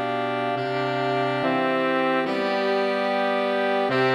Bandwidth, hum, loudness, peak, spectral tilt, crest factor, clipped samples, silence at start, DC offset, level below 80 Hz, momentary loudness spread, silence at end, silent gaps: 11.5 kHz; none; -23 LUFS; -10 dBFS; -6 dB/octave; 14 dB; under 0.1%; 0 s; under 0.1%; -72 dBFS; 3 LU; 0 s; none